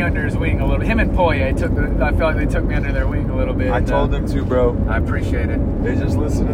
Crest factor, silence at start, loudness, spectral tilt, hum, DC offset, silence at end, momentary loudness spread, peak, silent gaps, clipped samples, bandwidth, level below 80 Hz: 14 dB; 0 s; -19 LUFS; -8 dB/octave; none; under 0.1%; 0 s; 4 LU; -2 dBFS; none; under 0.1%; 10.5 kHz; -22 dBFS